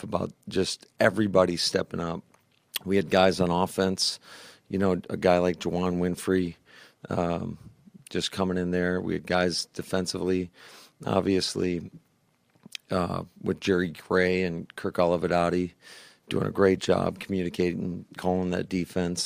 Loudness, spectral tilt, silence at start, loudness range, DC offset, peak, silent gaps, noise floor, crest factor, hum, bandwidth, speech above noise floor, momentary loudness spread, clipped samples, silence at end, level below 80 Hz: -27 LUFS; -5 dB/octave; 0 s; 4 LU; under 0.1%; -6 dBFS; none; -68 dBFS; 22 dB; none; 15.5 kHz; 41 dB; 12 LU; under 0.1%; 0 s; -58 dBFS